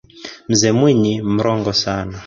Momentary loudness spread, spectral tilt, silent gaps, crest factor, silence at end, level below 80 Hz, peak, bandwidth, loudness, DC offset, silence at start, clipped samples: 11 LU; -5 dB/octave; none; 14 dB; 0 s; -44 dBFS; -2 dBFS; 7.8 kHz; -16 LUFS; under 0.1%; 0.15 s; under 0.1%